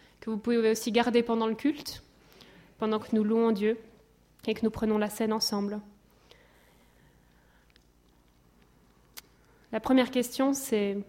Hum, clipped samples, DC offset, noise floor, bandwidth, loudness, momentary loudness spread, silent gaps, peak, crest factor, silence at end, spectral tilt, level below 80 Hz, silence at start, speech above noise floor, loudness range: 60 Hz at -60 dBFS; under 0.1%; under 0.1%; -63 dBFS; 16.5 kHz; -29 LUFS; 14 LU; none; -12 dBFS; 18 dB; 0.05 s; -4.5 dB/octave; -62 dBFS; 0.25 s; 35 dB; 7 LU